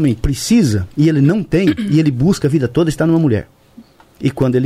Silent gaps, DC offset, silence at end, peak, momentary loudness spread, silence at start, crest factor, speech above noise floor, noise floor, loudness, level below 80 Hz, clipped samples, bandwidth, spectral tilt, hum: none; under 0.1%; 0 s; -2 dBFS; 5 LU; 0 s; 12 dB; 30 dB; -43 dBFS; -15 LUFS; -34 dBFS; under 0.1%; 15 kHz; -7 dB/octave; none